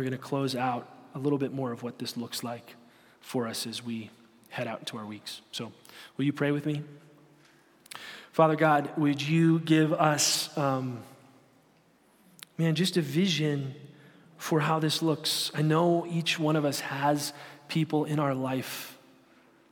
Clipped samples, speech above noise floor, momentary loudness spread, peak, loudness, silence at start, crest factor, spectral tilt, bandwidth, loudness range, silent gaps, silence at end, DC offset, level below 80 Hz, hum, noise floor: under 0.1%; 35 dB; 17 LU; -8 dBFS; -28 LUFS; 0 s; 22 dB; -5 dB/octave; 17.5 kHz; 11 LU; none; 0.75 s; under 0.1%; -78 dBFS; none; -63 dBFS